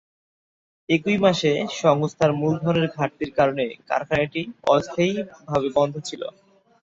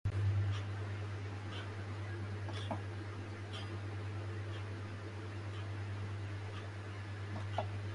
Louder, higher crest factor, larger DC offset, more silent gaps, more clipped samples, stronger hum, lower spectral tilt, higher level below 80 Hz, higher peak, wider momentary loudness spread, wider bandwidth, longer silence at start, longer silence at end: first, -22 LUFS vs -42 LUFS; about the same, 20 dB vs 18 dB; neither; neither; neither; neither; about the same, -6 dB/octave vs -6.5 dB/octave; about the same, -56 dBFS vs -54 dBFS; first, -4 dBFS vs -22 dBFS; about the same, 8 LU vs 7 LU; second, 7.8 kHz vs 11 kHz; first, 0.9 s vs 0.05 s; first, 0.55 s vs 0 s